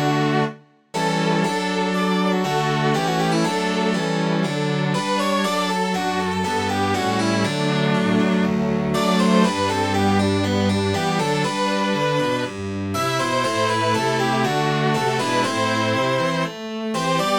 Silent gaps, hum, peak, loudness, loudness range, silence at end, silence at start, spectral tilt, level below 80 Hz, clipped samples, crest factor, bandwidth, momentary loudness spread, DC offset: none; none; -4 dBFS; -20 LUFS; 2 LU; 0 s; 0 s; -5 dB/octave; -56 dBFS; under 0.1%; 16 dB; 17.5 kHz; 4 LU; under 0.1%